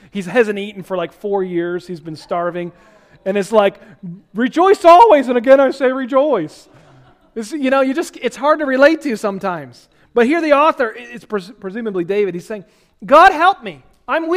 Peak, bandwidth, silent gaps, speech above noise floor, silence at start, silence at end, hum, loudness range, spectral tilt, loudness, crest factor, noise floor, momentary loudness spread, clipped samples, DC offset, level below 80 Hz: 0 dBFS; 15 kHz; none; 33 dB; 0.15 s; 0 s; none; 8 LU; -5.5 dB/octave; -15 LUFS; 16 dB; -48 dBFS; 20 LU; 0.3%; under 0.1%; -54 dBFS